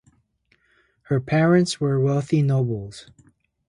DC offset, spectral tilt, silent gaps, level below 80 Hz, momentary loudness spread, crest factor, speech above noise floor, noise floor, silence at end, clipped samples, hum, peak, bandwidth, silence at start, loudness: under 0.1%; -7 dB/octave; none; -56 dBFS; 13 LU; 16 dB; 45 dB; -65 dBFS; 0.7 s; under 0.1%; none; -8 dBFS; 11 kHz; 1.1 s; -21 LUFS